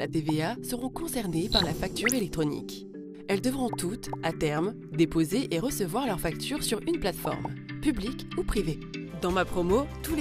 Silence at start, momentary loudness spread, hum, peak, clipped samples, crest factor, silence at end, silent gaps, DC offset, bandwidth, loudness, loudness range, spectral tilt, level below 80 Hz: 0 s; 8 LU; none; -10 dBFS; under 0.1%; 20 dB; 0 s; none; under 0.1%; 15.5 kHz; -29 LUFS; 2 LU; -4.5 dB/octave; -44 dBFS